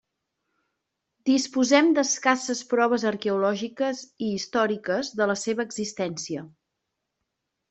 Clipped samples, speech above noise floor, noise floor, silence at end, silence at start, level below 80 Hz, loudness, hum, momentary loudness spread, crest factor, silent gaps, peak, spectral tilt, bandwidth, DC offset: under 0.1%; 57 dB; -82 dBFS; 1.2 s; 1.25 s; -70 dBFS; -25 LUFS; none; 10 LU; 20 dB; none; -6 dBFS; -3.5 dB/octave; 8.4 kHz; under 0.1%